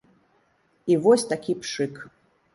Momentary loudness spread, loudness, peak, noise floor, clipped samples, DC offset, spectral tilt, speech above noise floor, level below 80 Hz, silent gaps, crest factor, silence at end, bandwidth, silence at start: 14 LU; -24 LUFS; -6 dBFS; -65 dBFS; under 0.1%; under 0.1%; -5 dB/octave; 43 dB; -70 dBFS; none; 20 dB; 0.45 s; 11.5 kHz; 0.85 s